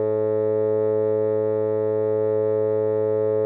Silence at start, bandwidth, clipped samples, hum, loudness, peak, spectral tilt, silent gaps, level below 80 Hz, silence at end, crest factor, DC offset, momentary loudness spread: 0 s; 3.6 kHz; under 0.1%; none; -22 LUFS; -14 dBFS; -12.5 dB/octave; none; -88 dBFS; 0 s; 8 dB; under 0.1%; 1 LU